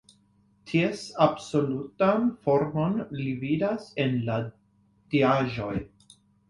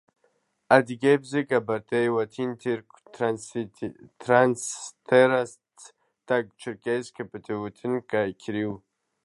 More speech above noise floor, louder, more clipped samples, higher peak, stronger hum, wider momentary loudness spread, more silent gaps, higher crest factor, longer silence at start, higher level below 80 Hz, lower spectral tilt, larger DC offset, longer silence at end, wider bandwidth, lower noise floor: second, 38 dB vs 45 dB; about the same, -27 LUFS vs -25 LUFS; neither; second, -6 dBFS vs -2 dBFS; neither; second, 9 LU vs 15 LU; neither; about the same, 22 dB vs 24 dB; about the same, 0.65 s vs 0.7 s; first, -58 dBFS vs -68 dBFS; first, -7 dB/octave vs -5 dB/octave; neither; about the same, 0.6 s vs 0.5 s; about the same, 11.5 kHz vs 11.5 kHz; second, -64 dBFS vs -70 dBFS